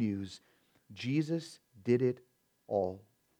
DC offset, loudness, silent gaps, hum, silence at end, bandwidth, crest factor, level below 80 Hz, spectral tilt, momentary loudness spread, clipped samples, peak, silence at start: under 0.1%; -35 LUFS; none; none; 0.4 s; 11.5 kHz; 20 dB; -78 dBFS; -7.5 dB/octave; 21 LU; under 0.1%; -16 dBFS; 0 s